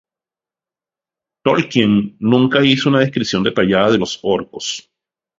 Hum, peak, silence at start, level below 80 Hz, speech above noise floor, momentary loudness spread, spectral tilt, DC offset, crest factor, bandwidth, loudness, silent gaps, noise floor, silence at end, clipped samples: none; 0 dBFS; 1.45 s; -52 dBFS; 75 dB; 10 LU; -5.5 dB/octave; under 0.1%; 16 dB; 7.8 kHz; -15 LUFS; none; -90 dBFS; 0.6 s; under 0.1%